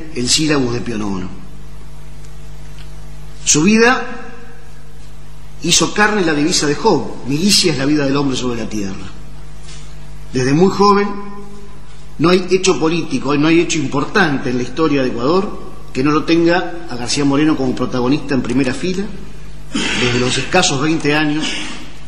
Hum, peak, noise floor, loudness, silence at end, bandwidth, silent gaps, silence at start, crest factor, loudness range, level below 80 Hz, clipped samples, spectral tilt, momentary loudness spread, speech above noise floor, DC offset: none; 0 dBFS; -37 dBFS; -15 LUFS; 0 s; 13 kHz; none; 0 s; 18 dB; 3 LU; -38 dBFS; under 0.1%; -4 dB/octave; 23 LU; 22 dB; 7%